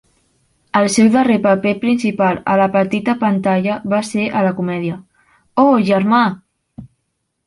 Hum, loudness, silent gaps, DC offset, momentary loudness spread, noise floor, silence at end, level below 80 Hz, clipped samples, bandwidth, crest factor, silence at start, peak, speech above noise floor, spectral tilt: none; -15 LUFS; none; under 0.1%; 8 LU; -71 dBFS; 0.6 s; -56 dBFS; under 0.1%; 11.5 kHz; 14 dB; 0.75 s; -2 dBFS; 56 dB; -6 dB/octave